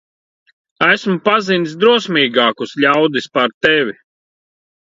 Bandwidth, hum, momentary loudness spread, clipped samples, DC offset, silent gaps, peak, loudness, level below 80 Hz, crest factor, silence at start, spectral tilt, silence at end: 7.8 kHz; none; 4 LU; under 0.1%; under 0.1%; 3.54-3.61 s; 0 dBFS; -14 LUFS; -60 dBFS; 16 dB; 0.8 s; -5 dB/octave; 0.9 s